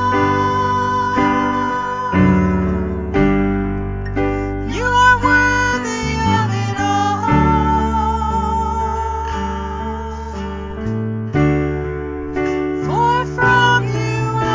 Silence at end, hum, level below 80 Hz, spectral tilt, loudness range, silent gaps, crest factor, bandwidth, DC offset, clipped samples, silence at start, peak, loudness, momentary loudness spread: 0 s; none; -28 dBFS; -6 dB/octave; 6 LU; none; 16 dB; 7.6 kHz; under 0.1%; under 0.1%; 0 s; 0 dBFS; -17 LUFS; 11 LU